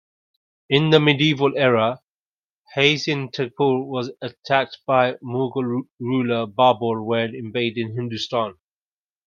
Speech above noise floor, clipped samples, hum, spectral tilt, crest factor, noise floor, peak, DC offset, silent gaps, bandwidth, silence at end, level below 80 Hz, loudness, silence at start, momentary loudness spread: over 70 dB; under 0.1%; none; -6 dB/octave; 22 dB; under -90 dBFS; 0 dBFS; under 0.1%; 2.10-2.62 s, 5.92-5.98 s; 7.2 kHz; 0.75 s; -64 dBFS; -21 LUFS; 0.7 s; 10 LU